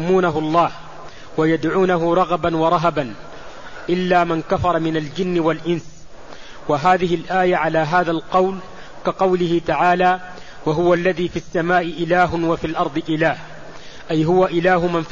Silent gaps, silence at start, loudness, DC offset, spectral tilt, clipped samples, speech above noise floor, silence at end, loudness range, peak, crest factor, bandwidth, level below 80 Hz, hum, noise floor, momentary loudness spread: none; 0 s; -18 LUFS; 1%; -6.5 dB/octave; under 0.1%; 22 dB; 0 s; 2 LU; -4 dBFS; 14 dB; 7.4 kHz; -44 dBFS; none; -39 dBFS; 16 LU